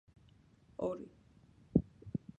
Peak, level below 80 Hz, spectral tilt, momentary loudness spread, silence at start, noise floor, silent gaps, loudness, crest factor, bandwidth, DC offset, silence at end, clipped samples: -14 dBFS; -58 dBFS; -10.5 dB/octave; 17 LU; 0.8 s; -65 dBFS; none; -39 LUFS; 28 dB; 8 kHz; under 0.1%; 0.25 s; under 0.1%